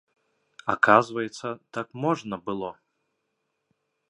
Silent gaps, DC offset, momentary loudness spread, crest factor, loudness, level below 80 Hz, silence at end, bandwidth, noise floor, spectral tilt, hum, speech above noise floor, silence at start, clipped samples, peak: none; under 0.1%; 16 LU; 26 dB; -25 LUFS; -68 dBFS; 1.35 s; 11 kHz; -78 dBFS; -5.5 dB/octave; none; 53 dB; 0.65 s; under 0.1%; -2 dBFS